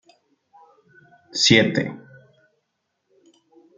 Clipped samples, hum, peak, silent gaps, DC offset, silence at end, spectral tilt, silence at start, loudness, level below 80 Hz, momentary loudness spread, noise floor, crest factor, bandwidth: under 0.1%; none; -2 dBFS; none; under 0.1%; 1.8 s; -3.5 dB/octave; 1.35 s; -18 LUFS; -60 dBFS; 18 LU; -76 dBFS; 24 dB; 9.6 kHz